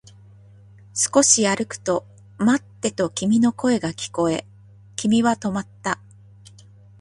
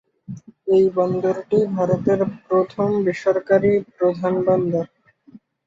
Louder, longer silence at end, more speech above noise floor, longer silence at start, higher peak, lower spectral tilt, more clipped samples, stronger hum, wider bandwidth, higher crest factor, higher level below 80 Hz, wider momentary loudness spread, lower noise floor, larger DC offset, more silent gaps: about the same, -21 LUFS vs -20 LUFS; first, 1.05 s vs 0.3 s; about the same, 27 dB vs 30 dB; first, 0.95 s vs 0.3 s; about the same, -2 dBFS vs -4 dBFS; second, -3.5 dB/octave vs -8.5 dB/octave; neither; neither; first, 11.5 kHz vs 7.4 kHz; about the same, 20 dB vs 16 dB; about the same, -58 dBFS vs -58 dBFS; about the same, 12 LU vs 10 LU; about the same, -47 dBFS vs -49 dBFS; neither; neither